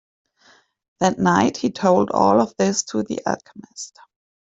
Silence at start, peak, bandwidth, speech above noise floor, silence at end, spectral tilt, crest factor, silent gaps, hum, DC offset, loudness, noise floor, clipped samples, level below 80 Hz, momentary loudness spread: 1 s; -2 dBFS; 8 kHz; 36 dB; 0.7 s; -5 dB/octave; 18 dB; none; none; under 0.1%; -19 LUFS; -56 dBFS; under 0.1%; -58 dBFS; 18 LU